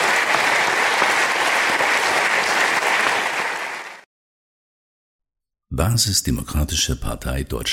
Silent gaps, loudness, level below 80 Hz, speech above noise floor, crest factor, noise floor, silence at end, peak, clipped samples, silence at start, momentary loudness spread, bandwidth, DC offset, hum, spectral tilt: 4.06-5.19 s; -18 LUFS; -34 dBFS; over 69 dB; 20 dB; under -90 dBFS; 0 s; -2 dBFS; under 0.1%; 0 s; 10 LU; 17 kHz; under 0.1%; none; -2.5 dB/octave